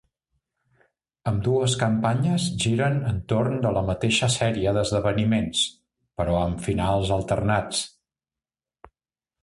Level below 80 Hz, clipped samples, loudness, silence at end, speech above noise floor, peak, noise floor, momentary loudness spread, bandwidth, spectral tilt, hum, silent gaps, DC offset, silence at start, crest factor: -42 dBFS; under 0.1%; -24 LUFS; 1.55 s; over 67 dB; -8 dBFS; under -90 dBFS; 5 LU; 11.5 kHz; -5 dB/octave; none; none; under 0.1%; 1.25 s; 18 dB